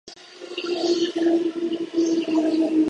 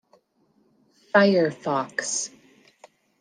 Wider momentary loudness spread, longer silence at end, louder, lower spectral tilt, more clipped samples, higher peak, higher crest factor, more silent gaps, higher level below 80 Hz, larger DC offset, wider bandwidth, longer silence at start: about the same, 12 LU vs 10 LU; second, 0 s vs 0.95 s; about the same, -23 LUFS vs -23 LUFS; about the same, -4 dB/octave vs -4 dB/octave; neither; second, -10 dBFS vs -4 dBFS; second, 12 dB vs 22 dB; neither; first, -70 dBFS vs -76 dBFS; neither; second, 9 kHz vs 10 kHz; second, 0.05 s vs 1.15 s